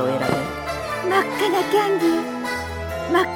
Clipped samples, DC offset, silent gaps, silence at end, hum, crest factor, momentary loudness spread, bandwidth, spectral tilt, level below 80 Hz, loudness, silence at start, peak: under 0.1%; under 0.1%; none; 0 s; none; 16 dB; 8 LU; 17.5 kHz; -5 dB/octave; -44 dBFS; -22 LUFS; 0 s; -4 dBFS